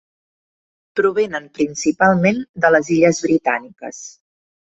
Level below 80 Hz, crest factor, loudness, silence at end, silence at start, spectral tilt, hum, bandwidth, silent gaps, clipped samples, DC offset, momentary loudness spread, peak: -56 dBFS; 16 dB; -17 LUFS; 0.6 s; 0.95 s; -5.5 dB/octave; none; 8 kHz; 2.49-2.54 s; under 0.1%; under 0.1%; 18 LU; -2 dBFS